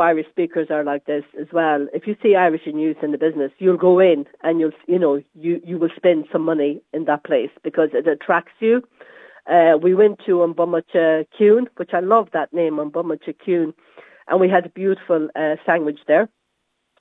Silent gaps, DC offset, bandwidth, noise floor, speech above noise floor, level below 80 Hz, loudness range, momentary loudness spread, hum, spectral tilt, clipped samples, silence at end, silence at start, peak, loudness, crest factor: none; under 0.1%; 3.9 kHz; -73 dBFS; 55 dB; -82 dBFS; 4 LU; 9 LU; none; -9 dB/octave; under 0.1%; 0.75 s; 0 s; -2 dBFS; -19 LUFS; 16 dB